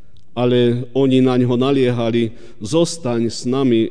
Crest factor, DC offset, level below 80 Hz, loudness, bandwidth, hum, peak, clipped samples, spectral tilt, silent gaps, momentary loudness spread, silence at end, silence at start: 14 dB; 3%; -54 dBFS; -17 LUFS; 10 kHz; none; -4 dBFS; under 0.1%; -6.5 dB/octave; none; 7 LU; 0 s; 0.35 s